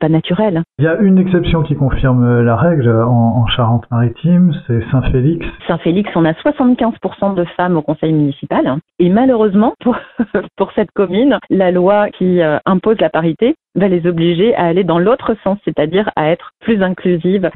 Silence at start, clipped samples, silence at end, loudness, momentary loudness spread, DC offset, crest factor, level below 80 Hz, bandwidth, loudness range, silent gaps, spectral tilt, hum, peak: 0 s; under 0.1%; 0.05 s; -13 LUFS; 6 LU; under 0.1%; 12 dB; -32 dBFS; 4.1 kHz; 2 LU; none; -12.5 dB/octave; none; 0 dBFS